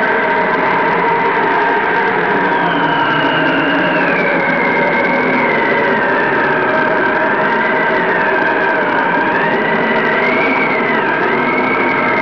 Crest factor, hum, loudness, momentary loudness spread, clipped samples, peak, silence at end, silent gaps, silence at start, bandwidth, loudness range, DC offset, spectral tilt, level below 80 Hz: 8 dB; none; -13 LUFS; 1 LU; under 0.1%; -6 dBFS; 0 s; none; 0 s; 5.4 kHz; 0 LU; 0.3%; -7 dB/octave; -52 dBFS